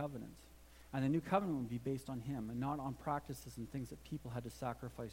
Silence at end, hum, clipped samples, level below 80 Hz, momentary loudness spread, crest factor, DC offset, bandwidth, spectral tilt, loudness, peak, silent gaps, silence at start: 0 s; none; under 0.1%; -62 dBFS; 13 LU; 22 dB; under 0.1%; 16.5 kHz; -7 dB/octave; -42 LUFS; -20 dBFS; none; 0 s